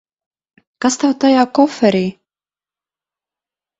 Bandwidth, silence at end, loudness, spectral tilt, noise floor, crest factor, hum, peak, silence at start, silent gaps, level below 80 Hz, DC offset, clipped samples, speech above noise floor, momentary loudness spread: 8.2 kHz; 1.7 s; -15 LUFS; -5 dB/octave; under -90 dBFS; 18 dB; 50 Hz at -50 dBFS; 0 dBFS; 0.8 s; none; -60 dBFS; under 0.1%; under 0.1%; over 77 dB; 7 LU